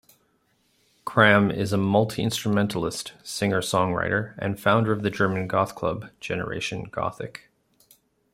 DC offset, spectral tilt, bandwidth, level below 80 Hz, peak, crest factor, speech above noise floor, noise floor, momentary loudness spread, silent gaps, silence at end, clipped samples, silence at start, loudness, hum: under 0.1%; -5.5 dB/octave; 16 kHz; -58 dBFS; -2 dBFS; 24 dB; 43 dB; -67 dBFS; 12 LU; none; 0.95 s; under 0.1%; 1.05 s; -24 LUFS; none